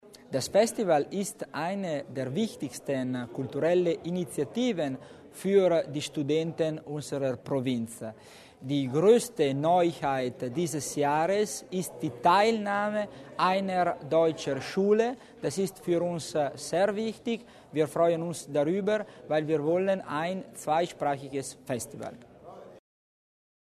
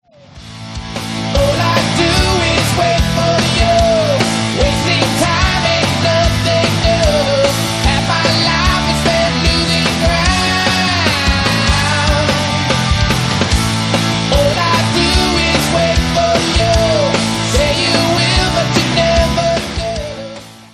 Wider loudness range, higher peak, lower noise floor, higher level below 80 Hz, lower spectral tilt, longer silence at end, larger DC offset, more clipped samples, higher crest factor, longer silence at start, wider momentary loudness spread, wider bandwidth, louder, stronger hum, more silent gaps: first, 4 LU vs 1 LU; second, -10 dBFS vs 0 dBFS; first, -48 dBFS vs -36 dBFS; second, -68 dBFS vs -22 dBFS; first, -5.5 dB/octave vs -4 dB/octave; first, 0.9 s vs 0.1 s; neither; neither; first, 20 dB vs 14 dB; second, 0.05 s vs 0.35 s; first, 11 LU vs 3 LU; about the same, 13.5 kHz vs 13.5 kHz; second, -29 LUFS vs -13 LUFS; neither; neither